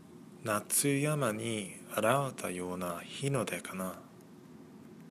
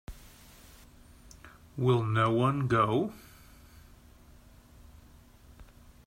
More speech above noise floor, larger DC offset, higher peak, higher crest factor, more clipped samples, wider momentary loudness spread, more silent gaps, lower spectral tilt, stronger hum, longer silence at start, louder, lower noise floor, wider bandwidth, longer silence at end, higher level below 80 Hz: second, 20 dB vs 29 dB; neither; about the same, -12 dBFS vs -14 dBFS; about the same, 22 dB vs 20 dB; neither; about the same, 24 LU vs 26 LU; neither; second, -4 dB/octave vs -7.5 dB/octave; neither; about the same, 0 s vs 0.1 s; second, -33 LUFS vs -28 LUFS; about the same, -54 dBFS vs -56 dBFS; about the same, 15.5 kHz vs 16 kHz; second, 0 s vs 0.45 s; second, -74 dBFS vs -56 dBFS